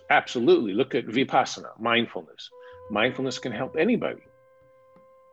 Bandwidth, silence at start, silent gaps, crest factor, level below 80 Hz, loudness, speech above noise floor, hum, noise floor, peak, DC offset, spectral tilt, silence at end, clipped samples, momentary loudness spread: 8 kHz; 0.1 s; none; 20 dB; -70 dBFS; -25 LUFS; 32 dB; none; -57 dBFS; -6 dBFS; under 0.1%; -4.5 dB/octave; 1.15 s; under 0.1%; 17 LU